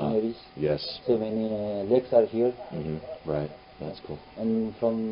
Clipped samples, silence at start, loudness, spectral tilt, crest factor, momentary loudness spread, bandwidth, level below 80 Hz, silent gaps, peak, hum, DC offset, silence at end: under 0.1%; 0 s; -28 LUFS; -11 dB/octave; 20 dB; 15 LU; 5.4 kHz; -56 dBFS; none; -8 dBFS; none; under 0.1%; 0 s